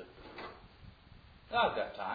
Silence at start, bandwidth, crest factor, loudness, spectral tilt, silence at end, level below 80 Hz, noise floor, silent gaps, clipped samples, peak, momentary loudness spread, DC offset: 0 s; 5 kHz; 22 dB; -34 LUFS; -1.5 dB/octave; 0 s; -62 dBFS; -58 dBFS; none; under 0.1%; -16 dBFS; 25 LU; under 0.1%